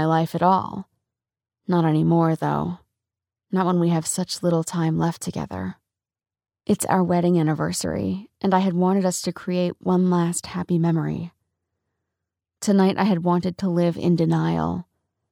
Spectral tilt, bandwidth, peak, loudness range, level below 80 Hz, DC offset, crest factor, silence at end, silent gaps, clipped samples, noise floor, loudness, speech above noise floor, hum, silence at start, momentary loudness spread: -6.5 dB/octave; 16 kHz; -6 dBFS; 3 LU; -56 dBFS; under 0.1%; 16 dB; 0.5 s; none; under 0.1%; -88 dBFS; -22 LUFS; 67 dB; none; 0 s; 10 LU